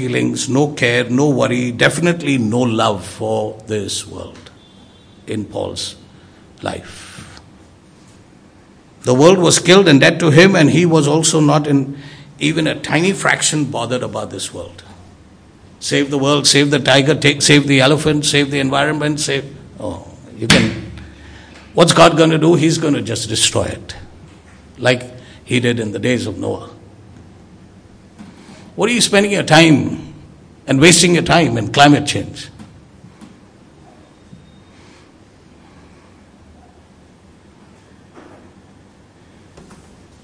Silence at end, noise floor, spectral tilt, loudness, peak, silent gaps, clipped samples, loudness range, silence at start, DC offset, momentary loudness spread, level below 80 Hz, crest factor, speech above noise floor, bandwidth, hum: 0.5 s; -45 dBFS; -4 dB/octave; -13 LUFS; 0 dBFS; none; 0.2%; 13 LU; 0 s; under 0.1%; 20 LU; -46 dBFS; 16 dB; 32 dB; 11 kHz; none